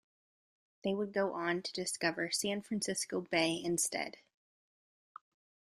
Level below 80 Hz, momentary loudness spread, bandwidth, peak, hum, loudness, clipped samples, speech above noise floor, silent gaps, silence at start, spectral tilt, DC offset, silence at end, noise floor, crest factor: -76 dBFS; 6 LU; 14 kHz; -16 dBFS; none; -35 LUFS; under 0.1%; over 54 dB; none; 0.85 s; -3 dB/octave; under 0.1%; 1.7 s; under -90 dBFS; 22 dB